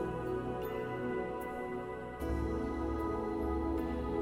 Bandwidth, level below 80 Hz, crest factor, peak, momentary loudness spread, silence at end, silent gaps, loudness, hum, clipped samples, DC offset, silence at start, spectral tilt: 16 kHz; -44 dBFS; 12 dB; -24 dBFS; 5 LU; 0 s; none; -37 LUFS; none; under 0.1%; under 0.1%; 0 s; -8 dB/octave